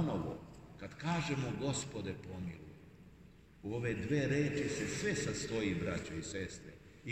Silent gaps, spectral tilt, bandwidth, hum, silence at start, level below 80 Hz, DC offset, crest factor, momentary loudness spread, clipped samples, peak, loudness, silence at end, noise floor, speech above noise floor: none; -5 dB/octave; 15 kHz; none; 0 s; -60 dBFS; under 0.1%; 16 dB; 18 LU; under 0.1%; -22 dBFS; -38 LUFS; 0 s; -60 dBFS; 22 dB